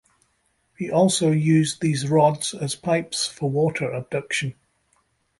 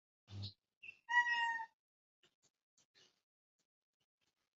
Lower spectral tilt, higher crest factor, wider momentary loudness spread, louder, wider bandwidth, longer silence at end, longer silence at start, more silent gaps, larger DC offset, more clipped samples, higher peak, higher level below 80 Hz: first, -5 dB/octave vs 1 dB/octave; second, 18 dB vs 24 dB; second, 9 LU vs 23 LU; first, -22 LUFS vs -36 LUFS; first, 11.5 kHz vs 7.6 kHz; second, 0.85 s vs 2.95 s; first, 0.8 s vs 0.3 s; second, none vs 0.77-0.81 s; neither; neither; first, -4 dBFS vs -22 dBFS; first, -60 dBFS vs -76 dBFS